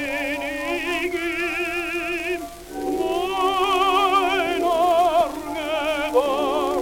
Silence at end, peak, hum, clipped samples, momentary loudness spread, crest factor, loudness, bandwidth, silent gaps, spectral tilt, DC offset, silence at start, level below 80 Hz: 0 s; -8 dBFS; none; under 0.1%; 8 LU; 14 dB; -22 LUFS; 18 kHz; none; -3 dB/octave; under 0.1%; 0 s; -48 dBFS